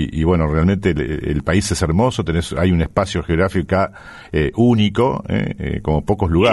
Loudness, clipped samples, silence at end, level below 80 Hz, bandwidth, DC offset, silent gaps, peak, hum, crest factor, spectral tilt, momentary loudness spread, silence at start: -18 LUFS; under 0.1%; 0 s; -30 dBFS; 11.5 kHz; under 0.1%; none; -2 dBFS; none; 16 dB; -6.5 dB/octave; 6 LU; 0 s